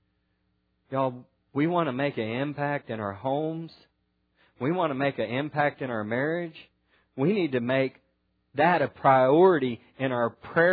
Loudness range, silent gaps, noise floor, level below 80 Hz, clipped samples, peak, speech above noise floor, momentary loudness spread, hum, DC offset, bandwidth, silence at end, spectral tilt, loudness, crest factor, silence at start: 6 LU; none; -73 dBFS; -70 dBFS; under 0.1%; -8 dBFS; 48 dB; 13 LU; none; under 0.1%; 4.9 kHz; 0 s; -10 dB/octave; -26 LUFS; 20 dB; 0.9 s